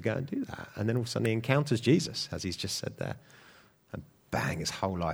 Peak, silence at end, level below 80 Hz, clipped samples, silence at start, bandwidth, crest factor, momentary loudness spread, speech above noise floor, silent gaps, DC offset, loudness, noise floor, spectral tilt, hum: -8 dBFS; 0 s; -58 dBFS; under 0.1%; 0 s; over 20 kHz; 24 dB; 17 LU; 28 dB; none; under 0.1%; -31 LUFS; -59 dBFS; -5 dB/octave; none